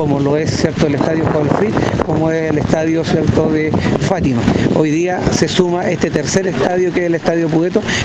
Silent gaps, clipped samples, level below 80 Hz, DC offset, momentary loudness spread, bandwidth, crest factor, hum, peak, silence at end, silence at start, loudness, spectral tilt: none; under 0.1%; -36 dBFS; under 0.1%; 2 LU; 9 kHz; 14 dB; none; 0 dBFS; 0 s; 0 s; -15 LUFS; -6 dB/octave